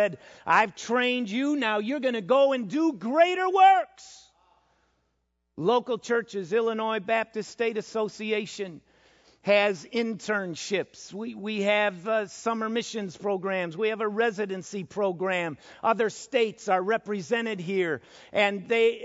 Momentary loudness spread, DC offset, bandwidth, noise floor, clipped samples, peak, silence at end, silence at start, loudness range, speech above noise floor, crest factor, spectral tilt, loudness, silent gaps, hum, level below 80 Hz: 10 LU; under 0.1%; 8 kHz; -76 dBFS; under 0.1%; -8 dBFS; 0 s; 0 s; 5 LU; 50 dB; 20 dB; -4.5 dB/octave; -26 LUFS; none; none; -74 dBFS